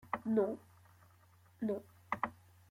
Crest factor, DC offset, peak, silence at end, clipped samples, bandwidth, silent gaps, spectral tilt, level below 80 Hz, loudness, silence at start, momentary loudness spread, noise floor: 20 dB; under 0.1%; -20 dBFS; 0.35 s; under 0.1%; 16 kHz; none; -8 dB/octave; -76 dBFS; -39 LUFS; 0.05 s; 10 LU; -65 dBFS